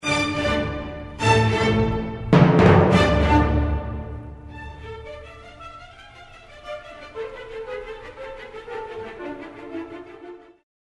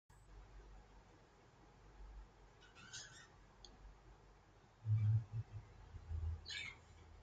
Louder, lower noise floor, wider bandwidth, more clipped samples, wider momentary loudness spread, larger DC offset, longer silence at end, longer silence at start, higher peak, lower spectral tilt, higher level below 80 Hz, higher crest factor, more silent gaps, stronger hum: first, -19 LUFS vs -45 LUFS; second, -45 dBFS vs -67 dBFS; first, 11.5 kHz vs 8.4 kHz; neither; second, 24 LU vs 27 LU; neither; first, 0.5 s vs 0 s; about the same, 0.05 s vs 0.1 s; first, -2 dBFS vs -28 dBFS; first, -6.5 dB/octave vs -5 dB/octave; first, -34 dBFS vs -60 dBFS; about the same, 22 dB vs 18 dB; neither; neither